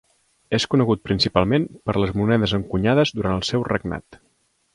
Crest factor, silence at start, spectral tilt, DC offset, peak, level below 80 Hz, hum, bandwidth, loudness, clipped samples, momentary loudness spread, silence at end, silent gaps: 20 dB; 0.5 s; -6 dB/octave; under 0.1%; 0 dBFS; -42 dBFS; none; 11 kHz; -21 LUFS; under 0.1%; 6 LU; 0.6 s; none